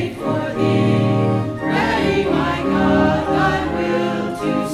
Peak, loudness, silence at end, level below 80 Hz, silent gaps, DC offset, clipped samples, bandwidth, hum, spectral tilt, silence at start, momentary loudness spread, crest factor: -4 dBFS; -18 LUFS; 0 s; -38 dBFS; none; under 0.1%; under 0.1%; 14 kHz; none; -7 dB/octave; 0 s; 5 LU; 14 dB